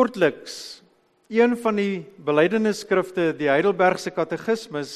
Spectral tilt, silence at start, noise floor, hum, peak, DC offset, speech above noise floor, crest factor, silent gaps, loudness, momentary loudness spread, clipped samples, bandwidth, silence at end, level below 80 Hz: -5.5 dB/octave; 0 s; -60 dBFS; none; -4 dBFS; under 0.1%; 38 dB; 18 dB; none; -22 LUFS; 9 LU; under 0.1%; 13 kHz; 0 s; -68 dBFS